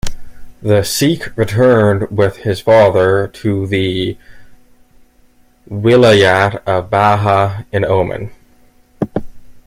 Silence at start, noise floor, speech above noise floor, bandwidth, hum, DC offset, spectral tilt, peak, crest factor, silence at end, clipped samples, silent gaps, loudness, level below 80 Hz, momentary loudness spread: 0.05 s; -49 dBFS; 37 dB; 16 kHz; none; under 0.1%; -5.5 dB/octave; 0 dBFS; 14 dB; 0.1 s; under 0.1%; none; -13 LUFS; -38 dBFS; 14 LU